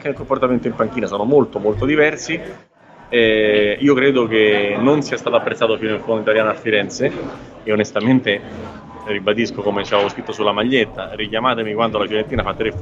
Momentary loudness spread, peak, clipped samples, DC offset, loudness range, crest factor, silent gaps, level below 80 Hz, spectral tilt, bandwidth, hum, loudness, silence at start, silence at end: 9 LU; -2 dBFS; under 0.1%; under 0.1%; 4 LU; 16 dB; none; -44 dBFS; -5.5 dB/octave; 7.8 kHz; none; -17 LUFS; 0 s; 0 s